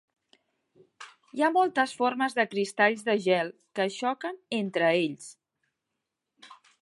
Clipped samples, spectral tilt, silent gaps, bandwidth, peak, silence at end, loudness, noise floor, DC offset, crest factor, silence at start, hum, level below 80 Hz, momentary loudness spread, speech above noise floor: under 0.1%; -4.5 dB/octave; none; 11.5 kHz; -10 dBFS; 0.3 s; -27 LUFS; -85 dBFS; under 0.1%; 20 dB; 1 s; none; -84 dBFS; 18 LU; 58 dB